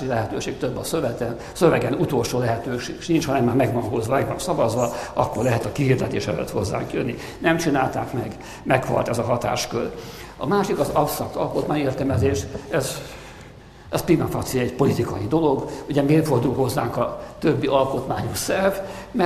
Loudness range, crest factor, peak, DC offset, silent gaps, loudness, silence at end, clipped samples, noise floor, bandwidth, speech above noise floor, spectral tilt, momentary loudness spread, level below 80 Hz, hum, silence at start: 2 LU; 20 dB; -2 dBFS; under 0.1%; none; -23 LUFS; 0 s; under 0.1%; -43 dBFS; 14.5 kHz; 21 dB; -6 dB/octave; 9 LU; -44 dBFS; none; 0 s